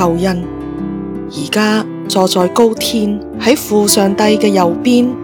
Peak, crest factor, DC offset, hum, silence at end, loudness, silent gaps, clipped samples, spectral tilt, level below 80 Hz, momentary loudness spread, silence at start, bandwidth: 0 dBFS; 12 dB; under 0.1%; none; 0 s; -13 LUFS; none; 0.3%; -4.5 dB/octave; -40 dBFS; 11 LU; 0 s; 20 kHz